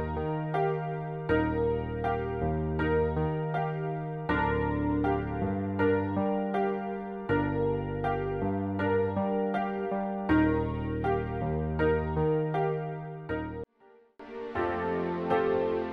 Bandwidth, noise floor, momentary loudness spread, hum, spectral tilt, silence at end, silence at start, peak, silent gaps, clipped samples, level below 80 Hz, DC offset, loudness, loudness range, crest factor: 5.2 kHz; -60 dBFS; 7 LU; none; -10 dB/octave; 0 s; 0 s; -14 dBFS; none; under 0.1%; -44 dBFS; under 0.1%; -30 LUFS; 3 LU; 16 dB